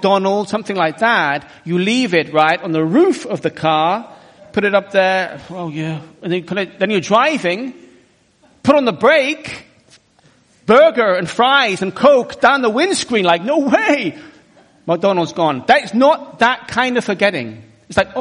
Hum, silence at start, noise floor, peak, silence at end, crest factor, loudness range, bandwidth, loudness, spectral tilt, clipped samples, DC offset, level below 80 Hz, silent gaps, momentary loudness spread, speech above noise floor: none; 0 s; -53 dBFS; 0 dBFS; 0 s; 16 dB; 5 LU; 10.5 kHz; -15 LUFS; -4.5 dB/octave; under 0.1%; under 0.1%; -56 dBFS; none; 11 LU; 38 dB